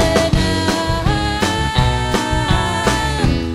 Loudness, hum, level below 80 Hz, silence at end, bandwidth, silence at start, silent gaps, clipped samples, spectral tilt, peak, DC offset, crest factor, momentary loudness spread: -17 LUFS; none; -24 dBFS; 0 s; 16 kHz; 0 s; none; under 0.1%; -5 dB/octave; 0 dBFS; under 0.1%; 16 dB; 2 LU